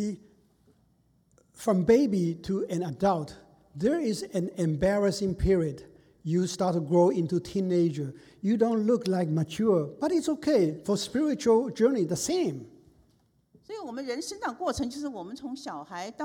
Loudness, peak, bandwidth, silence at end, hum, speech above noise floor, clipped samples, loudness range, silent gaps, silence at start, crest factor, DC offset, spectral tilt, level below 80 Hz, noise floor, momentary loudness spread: -28 LUFS; -10 dBFS; 17.5 kHz; 0 s; none; 40 dB; under 0.1%; 6 LU; none; 0 s; 18 dB; under 0.1%; -6.5 dB/octave; -50 dBFS; -67 dBFS; 15 LU